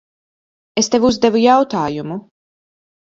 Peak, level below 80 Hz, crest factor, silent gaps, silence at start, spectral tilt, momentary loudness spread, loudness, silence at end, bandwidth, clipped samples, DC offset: 0 dBFS; -50 dBFS; 18 dB; none; 0.75 s; -4 dB/octave; 14 LU; -15 LUFS; 0.85 s; 7.8 kHz; under 0.1%; under 0.1%